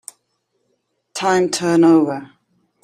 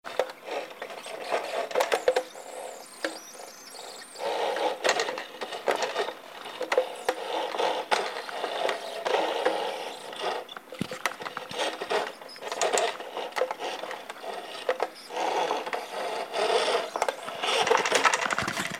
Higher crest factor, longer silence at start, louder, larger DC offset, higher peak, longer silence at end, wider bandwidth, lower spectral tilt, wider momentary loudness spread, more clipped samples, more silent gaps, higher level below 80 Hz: second, 16 dB vs 24 dB; first, 1.15 s vs 0.05 s; first, -16 LUFS vs -29 LUFS; neither; first, -2 dBFS vs -6 dBFS; first, 0.6 s vs 0 s; second, 14 kHz vs 16 kHz; first, -5 dB/octave vs -1.5 dB/octave; first, 19 LU vs 13 LU; neither; neither; first, -66 dBFS vs -72 dBFS